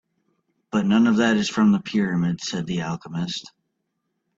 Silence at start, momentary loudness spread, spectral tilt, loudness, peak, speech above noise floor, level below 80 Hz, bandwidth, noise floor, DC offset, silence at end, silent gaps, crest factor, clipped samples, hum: 0.75 s; 11 LU; -5.5 dB/octave; -22 LUFS; -6 dBFS; 55 dB; -60 dBFS; 7.8 kHz; -76 dBFS; under 0.1%; 0.9 s; none; 18 dB; under 0.1%; none